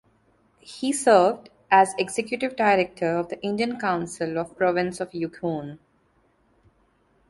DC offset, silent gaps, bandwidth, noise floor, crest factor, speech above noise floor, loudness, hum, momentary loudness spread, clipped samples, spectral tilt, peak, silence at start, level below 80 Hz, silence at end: under 0.1%; none; 11.5 kHz; -64 dBFS; 20 dB; 41 dB; -24 LUFS; none; 12 LU; under 0.1%; -4.5 dB/octave; -4 dBFS; 0.65 s; -64 dBFS; 1.55 s